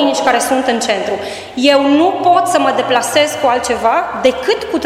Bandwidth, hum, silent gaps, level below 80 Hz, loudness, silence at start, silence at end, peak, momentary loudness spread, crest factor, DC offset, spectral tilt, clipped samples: 16 kHz; none; none; -48 dBFS; -13 LUFS; 0 s; 0 s; 0 dBFS; 5 LU; 12 dB; under 0.1%; -2.5 dB/octave; under 0.1%